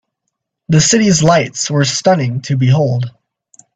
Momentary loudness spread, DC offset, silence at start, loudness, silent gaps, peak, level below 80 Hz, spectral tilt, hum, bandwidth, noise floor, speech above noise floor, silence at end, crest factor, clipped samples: 7 LU; under 0.1%; 0.7 s; -13 LUFS; none; 0 dBFS; -48 dBFS; -4.5 dB/octave; none; 9 kHz; -74 dBFS; 62 dB; 0.65 s; 14 dB; under 0.1%